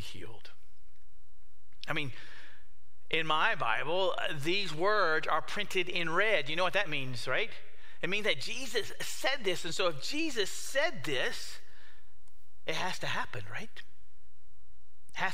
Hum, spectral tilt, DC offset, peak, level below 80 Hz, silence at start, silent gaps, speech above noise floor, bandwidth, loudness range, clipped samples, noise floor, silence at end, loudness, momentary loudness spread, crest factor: none; -3 dB/octave; 3%; -12 dBFS; -66 dBFS; 0 s; none; 32 dB; 16 kHz; 10 LU; under 0.1%; -65 dBFS; 0 s; -32 LUFS; 17 LU; 22 dB